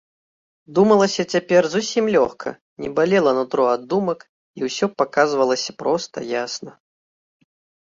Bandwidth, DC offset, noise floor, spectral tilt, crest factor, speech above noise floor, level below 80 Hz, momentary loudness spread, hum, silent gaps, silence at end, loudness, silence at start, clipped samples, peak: 7.8 kHz; under 0.1%; under -90 dBFS; -4.5 dB/octave; 18 dB; over 71 dB; -62 dBFS; 12 LU; none; 2.61-2.77 s, 4.29-4.54 s; 1.15 s; -20 LUFS; 0.7 s; under 0.1%; -2 dBFS